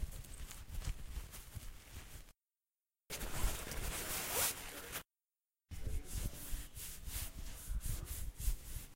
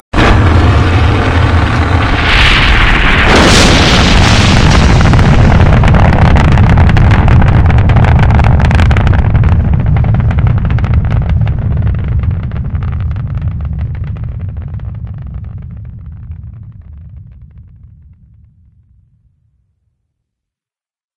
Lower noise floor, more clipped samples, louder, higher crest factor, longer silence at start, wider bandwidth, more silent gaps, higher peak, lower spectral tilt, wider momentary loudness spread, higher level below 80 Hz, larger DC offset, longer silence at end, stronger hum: about the same, under -90 dBFS vs under -90 dBFS; second, under 0.1% vs 2%; second, -44 LUFS vs -9 LUFS; first, 22 dB vs 8 dB; second, 0 s vs 0.15 s; first, 16 kHz vs 11 kHz; neither; second, -22 dBFS vs 0 dBFS; second, -2.5 dB/octave vs -5.5 dB/octave; about the same, 16 LU vs 16 LU; second, -46 dBFS vs -14 dBFS; neither; second, 0 s vs 3.7 s; neither